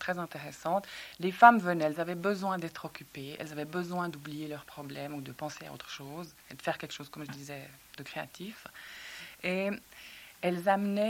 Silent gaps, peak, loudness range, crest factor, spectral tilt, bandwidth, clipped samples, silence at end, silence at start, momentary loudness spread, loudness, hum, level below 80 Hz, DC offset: none; -6 dBFS; 13 LU; 26 dB; -5.5 dB/octave; 17 kHz; under 0.1%; 0 s; 0 s; 16 LU; -32 LUFS; none; -72 dBFS; under 0.1%